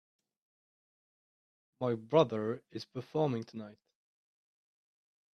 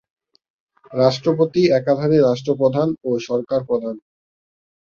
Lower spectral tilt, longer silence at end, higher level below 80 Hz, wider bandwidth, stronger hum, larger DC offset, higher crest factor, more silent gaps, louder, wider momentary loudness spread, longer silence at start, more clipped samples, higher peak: about the same, -7.5 dB/octave vs -7 dB/octave; first, 1.6 s vs 0.85 s; second, -78 dBFS vs -60 dBFS; about the same, 6.6 kHz vs 7.2 kHz; neither; neither; first, 26 dB vs 18 dB; neither; second, -34 LUFS vs -18 LUFS; first, 17 LU vs 8 LU; first, 1.8 s vs 0.9 s; neither; second, -12 dBFS vs -2 dBFS